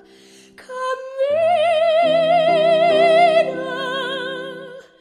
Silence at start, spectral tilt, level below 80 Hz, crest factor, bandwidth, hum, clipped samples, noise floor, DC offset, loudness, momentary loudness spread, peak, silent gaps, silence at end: 0.6 s; -4.5 dB/octave; -68 dBFS; 14 dB; 10.5 kHz; none; under 0.1%; -47 dBFS; under 0.1%; -17 LUFS; 14 LU; -4 dBFS; none; 0.2 s